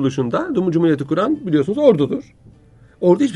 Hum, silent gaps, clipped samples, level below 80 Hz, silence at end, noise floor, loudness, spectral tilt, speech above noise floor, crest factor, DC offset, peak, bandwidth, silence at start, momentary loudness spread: none; none; under 0.1%; -54 dBFS; 0 s; -48 dBFS; -18 LUFS; -8 dB/octave; 31 dB; 16 dB; under 0.1%; 0 dBFS; 10.5 kHz; 0 s; 6 LU